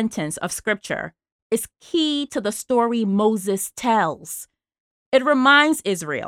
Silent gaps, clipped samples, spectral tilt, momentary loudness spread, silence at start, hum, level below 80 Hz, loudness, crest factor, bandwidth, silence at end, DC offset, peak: 1.32-1.50 s, 4.80-5.12 s; under 0.1%; -3.5 dB/octave; 13 LU; 0 s; none; -60 dBFS; -20 LUFS; 18 dB; 17 kHz; 0 s; under 0.1%; -4 dBFS